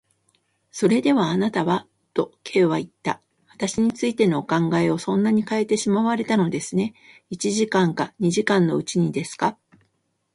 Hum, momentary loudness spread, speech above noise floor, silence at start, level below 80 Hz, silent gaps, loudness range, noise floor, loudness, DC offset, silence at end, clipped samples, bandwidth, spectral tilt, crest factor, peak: none; 8 LU; 50 dB; 0.75 s; -62 dBFS; none; 2 LU; -71 dBFS; -22 LUFS; under 0.1%; 0.8 s; under 0.1%; 11.5 kHz; -5.5 dB/octave; 18 dB; -4 dBFS